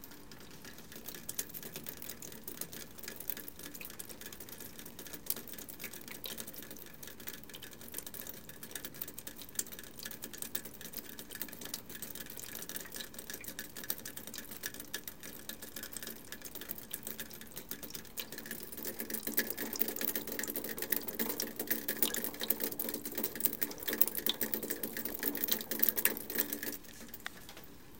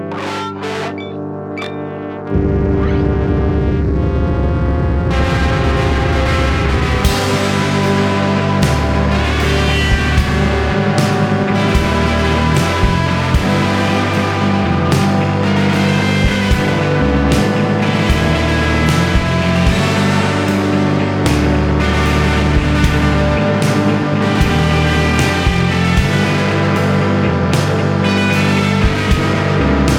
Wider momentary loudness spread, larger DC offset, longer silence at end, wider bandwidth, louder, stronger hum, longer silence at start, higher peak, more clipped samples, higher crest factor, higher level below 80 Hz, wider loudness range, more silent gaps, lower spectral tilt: first, 14 LU vs 3 LU; first, 0.2% vs under 0.1%; about the same, 0 s vs 0 s; about the same, 17 kHz vs 17 kHz; second, -38 LUFS vs -14 LUFS; second, none vs 50 Hz at -40 dBFS; about the same, 0 s vs 0 s; second, -6 dBFS vs 0 dBFS; neither; first, 34 dB vs 14 dB; second, -66 dBFS vs -22 dBFS; first, 11 LU vs 2 LU; neither; second, -1.5 dB/octave vs -6 dB/octave